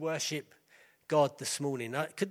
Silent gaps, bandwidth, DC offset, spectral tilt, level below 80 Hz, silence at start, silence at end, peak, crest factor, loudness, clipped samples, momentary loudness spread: none; 16 kHz; under 0.1%; -4 dB/octave; -82 dBFS; 0 s; 0 s; -16 dBFS; 18 dB; -33 LUFS; under 0.1%; 7 LU